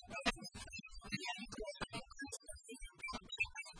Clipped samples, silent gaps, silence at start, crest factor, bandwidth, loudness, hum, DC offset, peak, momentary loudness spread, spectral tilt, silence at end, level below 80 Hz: under 0.1%; none; 0 s; 24 dB; 10.5 kHz; -45 LUFS; none; under 0.1%; -22 dBFS; 10 LU; -2.5 dB/octave; 0 s; -58 dBFS